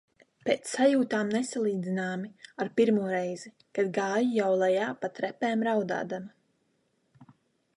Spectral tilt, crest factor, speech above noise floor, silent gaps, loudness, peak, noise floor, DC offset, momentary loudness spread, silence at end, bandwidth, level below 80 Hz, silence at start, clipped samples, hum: -5.5 dB/octave; 18 dB; 45 dB; none; -29 LUFS; -10 dBFS; -73 dBFS; under 0.1%; 12 LU; 0.55 s; 11.5 kHz; -78 dBFS; 0.45 s; under 0.1%; none